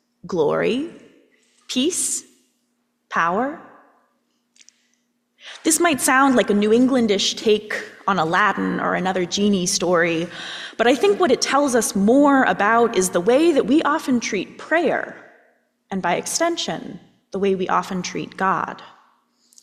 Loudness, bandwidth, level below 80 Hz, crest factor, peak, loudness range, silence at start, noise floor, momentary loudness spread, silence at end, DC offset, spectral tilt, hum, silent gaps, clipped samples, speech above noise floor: -19 LUFS; 15.5 kHz; -60 dBFS; 16 dB; -4 dBFS; 8 LU; 0.25 s; -70 dBFS; 12 LU; 0.75 s; under 0.1%; -3.5 dB/octave; none; none; under 0.1%; 51 dB